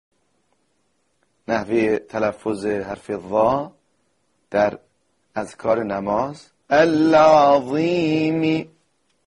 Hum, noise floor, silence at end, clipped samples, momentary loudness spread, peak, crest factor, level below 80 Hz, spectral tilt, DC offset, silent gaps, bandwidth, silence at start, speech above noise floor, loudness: none; -69 dBFS; 0.6 s; under 0.1%; 16 LU; -4 dBFS; 16 dB; -56 dBFS; -6.5 dB/octave; under 0.1%; none; 10.5 kHz; 1.5 s; 50 dB; -20 LUFS